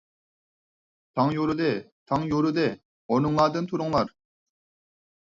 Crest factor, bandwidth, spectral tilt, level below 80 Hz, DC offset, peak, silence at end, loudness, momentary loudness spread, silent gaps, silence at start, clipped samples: 20 dB; 7.6 kHz; -7.5 dB/octave; -58 dBFS; under 0.1%; -8 dBFS; 1.3 s; -26 LUFS; 10 LU; 1.92-2.06 s, 2.85-3.09 s; 1.15 s; under 0.1%